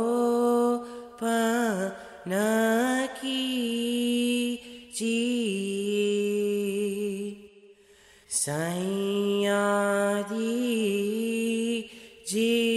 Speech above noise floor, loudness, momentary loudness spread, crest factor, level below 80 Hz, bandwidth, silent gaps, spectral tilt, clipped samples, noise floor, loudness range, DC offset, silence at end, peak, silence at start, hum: 30 dB; -27 LUFS; 9 LU; 14 dB; -70 dBFS; 14.5 kHz; none; -4 dB/octave; under 0.1%; -56 dBFS; 3 LU; under 0.1%; 0 s; -14 dBFS; 0 s; none